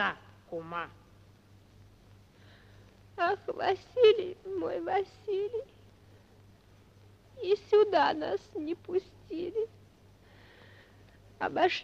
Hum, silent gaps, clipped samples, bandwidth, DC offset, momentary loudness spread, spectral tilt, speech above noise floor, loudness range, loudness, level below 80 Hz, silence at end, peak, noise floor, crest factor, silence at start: none; none; under 0.1%; 7.2 kHz; under 0.1%; 17 LU; -5.5 dB/octave; 29 dB; 8 LU; -31 LUFS; -66 dBFS; 0 s; -12 dBFS; -59 dBFS; 22 dB; 0 s